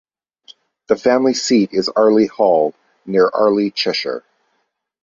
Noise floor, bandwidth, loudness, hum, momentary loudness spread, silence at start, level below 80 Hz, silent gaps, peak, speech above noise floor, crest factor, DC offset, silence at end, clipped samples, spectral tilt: -69 dBFS; 7.8 kHz; -16 LUFS; none; 8 LU; 0.5 s; -62 dBFS; none; -2 dBFS; 54 dB; 16 dB; under 0.1%; 0.85 s; under 0.1%; -4.5 dB/octave